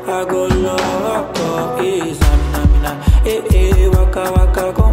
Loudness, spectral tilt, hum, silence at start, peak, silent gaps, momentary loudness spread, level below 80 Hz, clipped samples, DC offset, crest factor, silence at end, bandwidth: -15 LUFS; -6.5 dB/octave; none; 0 s; 0 dBFS; none; 6 LU; -16 dBFS; under 0.1%; under 0.1%; 12 dB; 0 s; 16 kHz